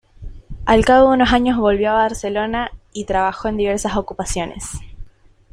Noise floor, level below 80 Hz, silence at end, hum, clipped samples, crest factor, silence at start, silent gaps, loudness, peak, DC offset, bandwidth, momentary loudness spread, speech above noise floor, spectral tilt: -44 dBFS; -34 dBFS; 0.45 s; none; under 0.1%; 16 dB; 0.2 s; none; -17 LUFS; -2 dBFS; under 0.1%; 14.5 kHz; 17 LU; 28 dB; -4.5 dB/octave